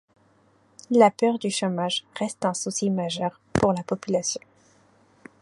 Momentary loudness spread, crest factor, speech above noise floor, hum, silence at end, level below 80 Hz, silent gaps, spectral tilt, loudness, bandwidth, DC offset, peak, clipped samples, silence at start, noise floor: 10 LU; 22 dB; 37 dB; none; 1.05 s; -56 dBFS; none; -4.5 dB/octave; -24 LUFS; 11.5 kHz; under 0.1%; -4 dBFS; under 0.1%; 0.9 s; -61 dBFS